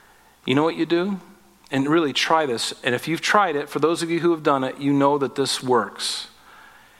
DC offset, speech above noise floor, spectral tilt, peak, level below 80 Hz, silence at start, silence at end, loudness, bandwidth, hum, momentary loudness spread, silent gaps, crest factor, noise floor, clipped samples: under 0.1%; 27 dB; -4.5 dB/octave; -2 dBFS; -66 dBFS; 0.45 s; 0.7 s; -21 LUFS; 15.5 kHz; none; 7 LU; none; 20 dB; -48 dBFS; under 0.1%